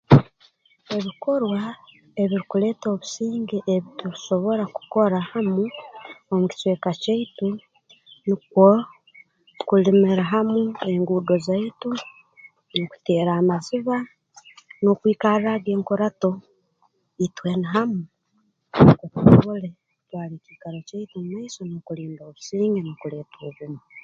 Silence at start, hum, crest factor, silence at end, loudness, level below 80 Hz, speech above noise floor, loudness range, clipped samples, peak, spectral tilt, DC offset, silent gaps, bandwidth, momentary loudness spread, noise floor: 0.1 s; none; 22 dB; 0.05 s; -22 LUFS; -50 dBFS; 46 dB; 6 LU; under 0.1%; 0 dBFS; -7.5 dB/octave; under 0.1%; none; 7.6 kHz; 20 LU; -68 dBFS